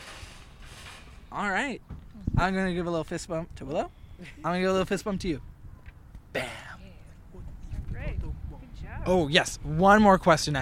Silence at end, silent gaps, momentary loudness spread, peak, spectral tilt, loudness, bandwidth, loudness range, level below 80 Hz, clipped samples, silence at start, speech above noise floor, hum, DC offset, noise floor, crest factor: 0 s; none; 25 LU; -4 dBFS; -5 dB/octave; -27 LUFS; 15.5 kHz; 13 LU; -42 dBFS; under 0.1%; 0 s; 22 dB; none; under 0.1%; -47 dBFS; 24 dB